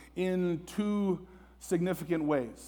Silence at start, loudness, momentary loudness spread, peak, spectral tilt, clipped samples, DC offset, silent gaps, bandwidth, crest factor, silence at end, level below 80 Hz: 0 s; -32 LUFS; 4 LU; -16 dBFS; -7 dB/octave; under 0.1%; under 0.1%; none; over 20 kHz; 16 dB; 0 s; -58 dBFS